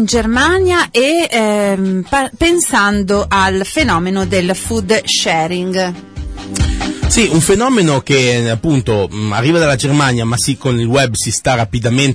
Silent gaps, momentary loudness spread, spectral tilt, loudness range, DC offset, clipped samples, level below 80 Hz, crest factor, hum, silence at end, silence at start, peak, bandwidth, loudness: none; 6 LU; -4.5 dB/octave; 2 LU; 0.2%; under 0.1%; -28 dBFS; 14 dB; none; 0 s; 0 s; 0 dBFS; 11 kHz; -13 LUFS